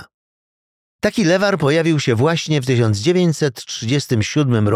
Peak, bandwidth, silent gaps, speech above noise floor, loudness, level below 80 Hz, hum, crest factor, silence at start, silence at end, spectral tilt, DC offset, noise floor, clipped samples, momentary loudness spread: -4 dBFS; 15 kHz; 0.14-0.99 s; over 74 dB; -17 LUFS; -54 dBFS; none; 14 dB; 0 s; 0 s; -5.5 dB/octave; under 0.1%; under -90 dBFS; under 0.1%; 5 LU